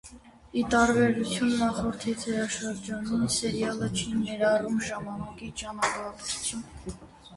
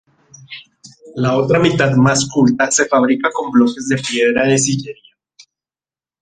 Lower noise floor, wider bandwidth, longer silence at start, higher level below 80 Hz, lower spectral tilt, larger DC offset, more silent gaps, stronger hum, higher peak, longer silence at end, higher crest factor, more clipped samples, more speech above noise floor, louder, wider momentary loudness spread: second, -50 dBFS vs under -90 dBFS; first, 11.5 kHz vs 9.8 kHz; second, 0.05 s vs 0.5 s; about the same, -52 dBFS vs -52 dBFS; about the same, -4 dB/octave vs -4.5 dB/octave; neither; neither; neither; second, -10 dBFS vs -2 dBFS; second, 0 s vs 1.3 s; first, 20 dB vs 14 dB; neither; second, 22 dB vs over 76 dB; second, -28 LUFS vs -14 LUFS; second, 14 LU vs 19 LU